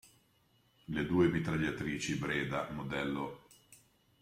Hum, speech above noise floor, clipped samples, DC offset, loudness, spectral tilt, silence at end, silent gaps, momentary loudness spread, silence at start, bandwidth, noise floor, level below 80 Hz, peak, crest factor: none; 37 dB; under 0.1%; under 0.1%; -35 LUFS; -5.5 dB/octave; 0.45 s; none; 11 LU; 0.9 s; 15.5 kHz; -71 dBFS; -60 dBFS; -16 dBFS; 20 dB